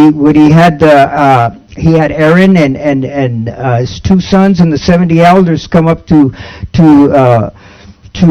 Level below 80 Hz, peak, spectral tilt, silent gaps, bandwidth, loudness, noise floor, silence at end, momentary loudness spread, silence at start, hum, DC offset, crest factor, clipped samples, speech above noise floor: -32 dBFS; 0 dBFS; -8 dB/octave; none; 9.4 kHz; -7 LUFS; -34 dBFS; 0 s; 9 LU; 0 s; none; under 0.1%; 6 dB; 5%; 27 dB